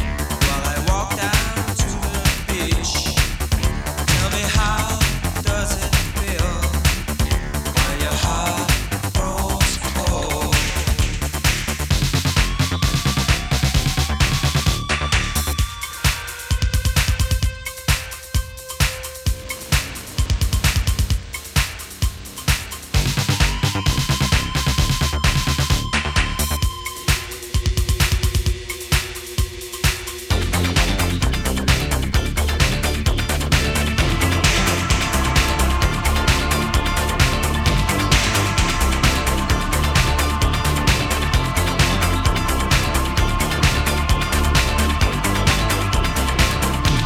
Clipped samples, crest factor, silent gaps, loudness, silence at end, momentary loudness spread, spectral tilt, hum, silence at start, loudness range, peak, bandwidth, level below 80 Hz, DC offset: under 0.1%; 18 dB; none; -20 LUFS; 0 s; 5 LU; -4 dB/octave; none; 0 s; 4 LU; 0 dBFS; 17 kHz; -24 dBFS; under 0.1%